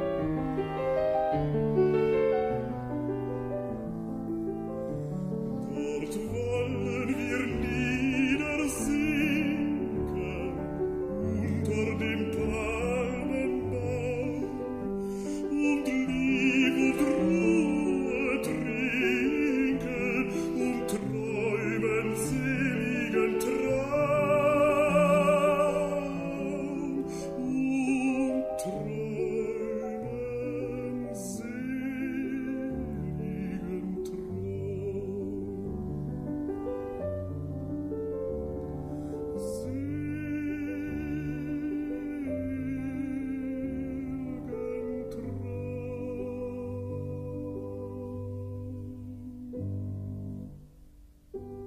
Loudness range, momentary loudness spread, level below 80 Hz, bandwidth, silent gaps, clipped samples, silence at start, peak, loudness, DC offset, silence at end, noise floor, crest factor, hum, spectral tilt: 9 LU; 11 LU; -48 dBFS; 15 kHz; none; under 0.1%; 0 s; -12 dBFS; -30 LUFS; under 0.1%; 0 s; -54 dBFS; 18 dB; none; -6.5 dB/octave